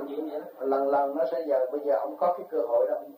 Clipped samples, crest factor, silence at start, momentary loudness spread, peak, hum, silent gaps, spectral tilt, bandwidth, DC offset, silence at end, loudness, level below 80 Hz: under 0.1%; 14 dB; 0 s; 8 LU; -14 dBFS; none; none; -7 dB/octave; 15.5 kHz; under 0.1%; 0.05 s; -28 LUFS; -90 dBFS